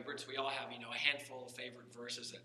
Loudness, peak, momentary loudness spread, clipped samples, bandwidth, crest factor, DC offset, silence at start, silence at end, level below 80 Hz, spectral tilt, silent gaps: -40 LUFS; -14 dBFS; 14 LU; under 0.1%; 14 kHz; 28 dB; under 0.1%; 0 s; 0 s; under -90 dBFS; -2 dB/octave; none